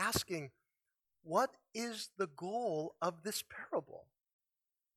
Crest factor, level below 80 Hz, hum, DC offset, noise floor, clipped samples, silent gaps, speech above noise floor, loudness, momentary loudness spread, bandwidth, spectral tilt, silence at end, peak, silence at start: 22 dB; -68 dBFS; none; under 0.1%; under -90 dBFS; under 0.1%; none; over 50 dB; -40 LUFS; 8 LU; 17 kHz; -3.5 dB/octave; 0.95 s; -18 dBFS; 0 s